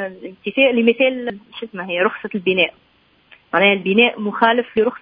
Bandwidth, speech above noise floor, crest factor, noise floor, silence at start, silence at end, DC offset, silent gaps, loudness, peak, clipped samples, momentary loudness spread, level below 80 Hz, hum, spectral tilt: 5.2 kHz; 34 dB; 18 dB; -52 dBFS; 0 s; 0.05 s; under 0.1%; none; -17 LUFS; 0 dBFS; under 0.1%; 15 LU; -62 dBFS; none; -8.5 dB/octave